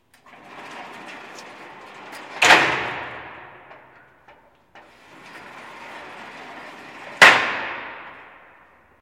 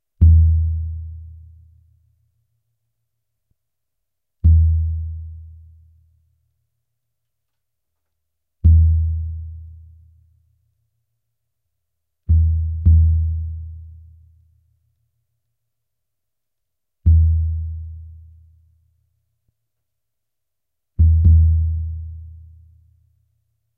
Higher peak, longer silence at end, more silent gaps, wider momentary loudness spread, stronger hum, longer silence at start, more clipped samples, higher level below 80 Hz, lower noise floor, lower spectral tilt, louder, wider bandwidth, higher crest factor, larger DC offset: about the same, 0 dBFS vs -2 dBFS; second, 0.9 s vs 1.5 s; neither; first, 28 LU vs 23 LU; neither; first, 0.55 s vs 0.2 s; neither; second, -62 dBFS vs -24 dBFS; second, -53 dBFS vs -84 dBFS; second, -1.5 dB/octave vs -14 dB/octave; about the same, -15 LUFS vs -17 LUFS; first, 16.5 kHz vs 0.5 kHz; first, 24 dB vs 18 dB; neither